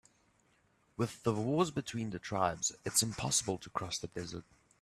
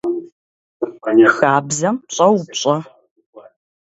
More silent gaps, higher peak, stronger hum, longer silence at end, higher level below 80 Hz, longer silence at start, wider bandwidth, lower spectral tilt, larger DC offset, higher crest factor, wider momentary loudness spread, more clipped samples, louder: second, none vs 0.32-0.80 s, 3.11-3.16 s, 3.26-3.33 s; second, -16 dBFS vs 0 dBFS; neither; about the same, 0.4 s vs 0.4 s; about the same, -64 dBFS vs -66 dBFS; first, 1 s vs 0.05 s; first, 14.5 kHz vs 8 kHz; about the same, -3.5 dB/octave vs -4.5 dB/octave; neither; about the same, 22 dB vs 18 dB; second, 11 LU vs 14 LU; neither; second, -35 LUFS vs -16 LUFS